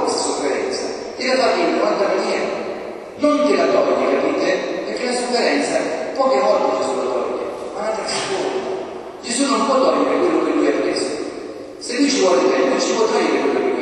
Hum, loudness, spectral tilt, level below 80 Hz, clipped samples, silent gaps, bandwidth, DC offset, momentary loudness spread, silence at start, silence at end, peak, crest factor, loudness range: none; -18 LUFS; -3 dB/octave; -58 dBFS; under 0.1%; none; 11.5 kHz; under 0.1%; 10 LU; 0 s; 0 s; -4 dBFS; 16 dB; 2 LU